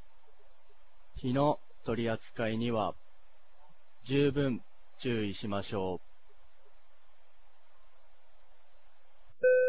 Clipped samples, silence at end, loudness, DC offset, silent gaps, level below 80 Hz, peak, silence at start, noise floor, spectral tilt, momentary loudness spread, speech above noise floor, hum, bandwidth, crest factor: under 0.1%; 0 s; -33 LUFS; 0.8%; none; -60 dBFS; -16 dBFS; 1.15 s; -66 dBFS; -5.5 dB/octave; 11 LU; 34 dB; none; 4 kHz; 18 dB